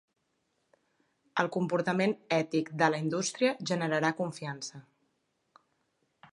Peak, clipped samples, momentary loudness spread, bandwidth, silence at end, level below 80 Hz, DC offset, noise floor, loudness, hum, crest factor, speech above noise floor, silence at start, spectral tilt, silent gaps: -8 dBFS; under 0.1%; 9 LU; 11.5 kHz; 1.5 s; -80 dBFS; under 0.1%; -77 dBFS; -31 LUFS; none; 24 dB; 47 dB; 1.35 s; -5 dB/octave; none